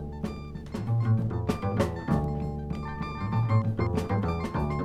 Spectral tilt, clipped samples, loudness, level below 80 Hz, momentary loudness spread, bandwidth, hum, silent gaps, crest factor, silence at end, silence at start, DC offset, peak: -8.5 dB/octave; under 0.1%; -29 LUFS; -40 dBFS; 10 LU; 11.5 kHz; none; none; 16 dB; 0 s; 0 s; under 0.1%; -12 dBFS